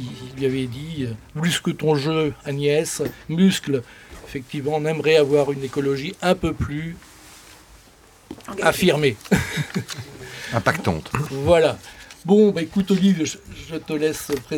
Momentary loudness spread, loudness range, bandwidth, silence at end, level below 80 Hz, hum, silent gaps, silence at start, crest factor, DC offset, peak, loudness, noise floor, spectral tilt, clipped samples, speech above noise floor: 17 LU; 4 LU; 18 kHz; 0 s; -46 dBFS; none; none; 0 s; 20 dB; under 0.1%; -2 dBFS; -21 LUFS; -50 dBFS; -5.5 dB/octave; under 0.1%; 29 dB